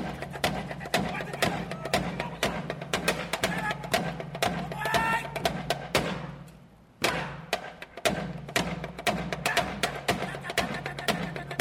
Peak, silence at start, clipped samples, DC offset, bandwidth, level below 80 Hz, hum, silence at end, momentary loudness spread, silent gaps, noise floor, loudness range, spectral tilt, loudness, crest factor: -12 dBFS; 0 s; under 0.1%; under 0.1%; 16.5 kHz; -50 dBFS; none; 0 s; 7 LU; none; -53 dBFS; 2 LU; -4 dB/octave; -30 LUFS; 20 dB